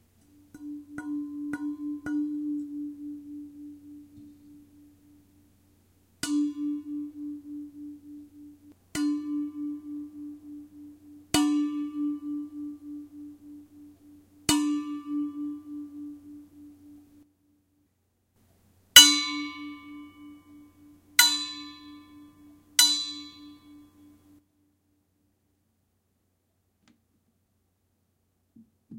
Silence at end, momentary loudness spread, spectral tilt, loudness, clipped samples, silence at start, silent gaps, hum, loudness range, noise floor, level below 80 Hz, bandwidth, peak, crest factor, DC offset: 0 s; 25 LU; 0 dB/octave; -24 LUFS; under 0.1%; 0.55 s; none; none; 17 LU; -74 dBFS; -64 dBFS; 16 kHz; 0 dBFS; 32 dB; under 0.1%